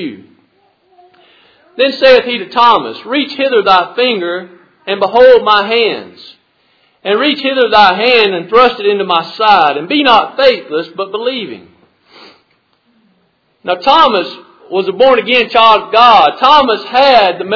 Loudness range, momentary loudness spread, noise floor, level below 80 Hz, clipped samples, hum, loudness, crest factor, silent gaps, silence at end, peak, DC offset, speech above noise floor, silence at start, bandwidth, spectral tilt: 7 LU; 13 LU; -57 dBFS; -50 dBFS; 1%; none; -9 LUFS; 12 dB; none; 0 s; 0 dBFS; under 0.1%; 47 dB; 0 s; 5.4 kHz; -5 dB/octave